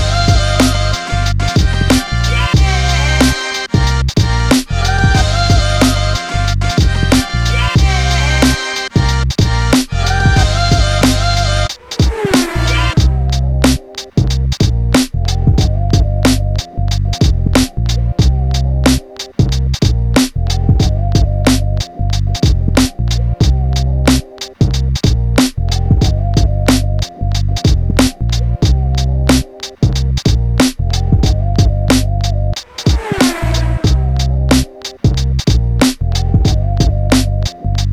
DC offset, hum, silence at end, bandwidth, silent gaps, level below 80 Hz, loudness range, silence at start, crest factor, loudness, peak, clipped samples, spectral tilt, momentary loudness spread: under 0.1%; none; 0 s; 14.5 kHz; none; -16 dBFS; 2 LU; 0 s; 12 dB; -13 LUFS; 0 dBFS; under 0.1%; -5 dB/octave; 5 LU